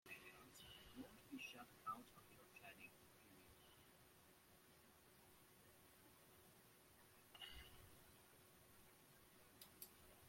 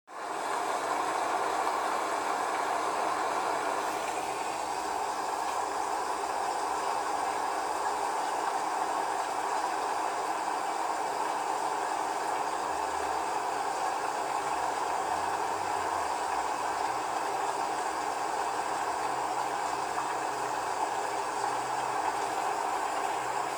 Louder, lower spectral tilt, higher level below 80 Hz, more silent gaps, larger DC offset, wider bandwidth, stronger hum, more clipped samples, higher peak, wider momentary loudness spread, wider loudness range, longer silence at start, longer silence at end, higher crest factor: second, -62 LUFS vs -31 LUFS; about the same, -3 dB/octave vs -2 dB/octave; second, -80 dBFS vs -66 dBFS; neither; neither; second, 16.5 kHz vs 20 kHz; neither; neither; second, -40 dBFS vs -16 dBFS; first, 13 LU vs 2 LU; first, 10 LU vs 1 LU; about the same, 0.05 s vs 0.1 s; about the same, 0 s vs 0 s; first, 24 dB vs 16 dB